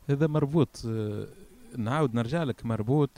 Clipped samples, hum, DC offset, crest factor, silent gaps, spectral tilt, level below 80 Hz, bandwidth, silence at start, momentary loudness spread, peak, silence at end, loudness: under 0.1%; none; under 0.1%; 18 dB; none; -8 dB/octave; -56 dBFS; 12.5 kHz; 0.05 s; 11 LU; -10 dBFS; 0.1 s; -29 LUFS